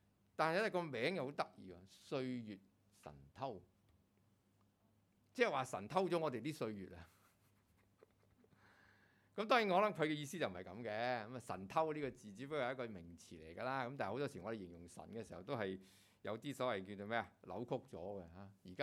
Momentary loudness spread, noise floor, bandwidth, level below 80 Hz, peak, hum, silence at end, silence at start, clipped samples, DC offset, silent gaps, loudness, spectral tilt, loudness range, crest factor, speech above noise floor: 19 LU; -77 dBFS; 16 kHz; -78 dBFS; -20 dBFS; none; 0 s; 0.4 s; under 0.1%; under 0.1%; none; -42 LUFS; -5.5 dB/octave; 9 LU; 24 dB; 34 dB